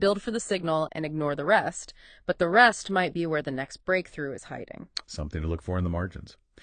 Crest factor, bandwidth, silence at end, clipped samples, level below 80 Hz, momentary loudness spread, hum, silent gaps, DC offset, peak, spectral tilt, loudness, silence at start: 24 dB; 9.8 kHz; 0.3 s; under 0.1%; -50 dBFS; 17 LU; none; none; under 0.1%; -4 dBFS; -5 dB/octave; -27 LUFS; 0 s